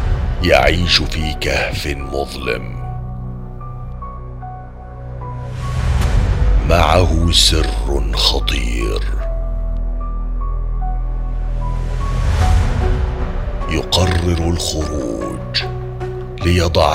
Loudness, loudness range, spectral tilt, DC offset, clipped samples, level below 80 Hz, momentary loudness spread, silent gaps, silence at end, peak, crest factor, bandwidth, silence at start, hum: -18 LUFS; 10 LU; -4.5 dB/octave; under 0.1%; under 0.1%; -20 dBFS; 17 LU; none; 0 s; 0 dBFS; 16 dB; 15.5 kHz; 0 s; none